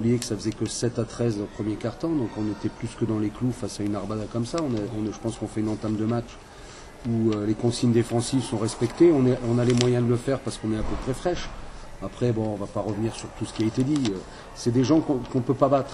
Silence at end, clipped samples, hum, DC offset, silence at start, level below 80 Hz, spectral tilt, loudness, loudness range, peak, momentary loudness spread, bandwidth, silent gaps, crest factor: 0 s; under 0.1%; none; under 0.1%; 0 s; -44 dBFS; -6.5 dB/octave; -26 LUFS; 6 LU; 0 dBFS; 11 LU; 12 kHz; none; 24 dB